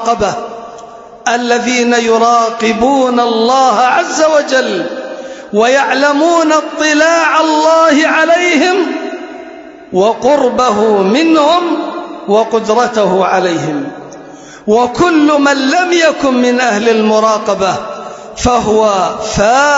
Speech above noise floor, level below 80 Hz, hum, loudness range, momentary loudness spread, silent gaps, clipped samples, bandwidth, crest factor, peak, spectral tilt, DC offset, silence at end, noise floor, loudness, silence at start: 22 dB; -42 dBFS; none; 3 LU; 14 LU; none; under 0.1%; 8 kHz; 10 dB; 0 dBFS; -3.5 dB/octave; under 0.1%; 0 s; -32 dBFS; -10 LUFS; 0 s